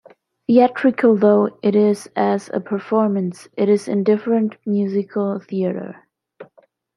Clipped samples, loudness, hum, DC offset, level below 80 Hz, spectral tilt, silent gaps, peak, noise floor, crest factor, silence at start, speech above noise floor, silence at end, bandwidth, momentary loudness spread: under 0.1%; -18 LUFS; none; under 0.1%; -70 dBFS; -7.5 dB/octave; none; -2 dBFS; -55 dBFS; 16 dB; 0.5 s; 38 dB; 0.55 s; 11.5 kHz; 9 LU